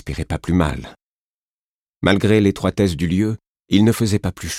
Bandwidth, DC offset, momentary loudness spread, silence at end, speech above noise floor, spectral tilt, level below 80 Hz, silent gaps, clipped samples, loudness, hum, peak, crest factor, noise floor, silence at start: 16 kHz; under 0.1%; 10 LU; 0 s; over 72 dB; -6 dB/octave; -38 dBFS; 1.03-2.01 s, 3.48-3.65 s; under 0.1%; -18 LUFS; none; 0 dBFS; 18 dB; under -90 dBFS; 0.05 s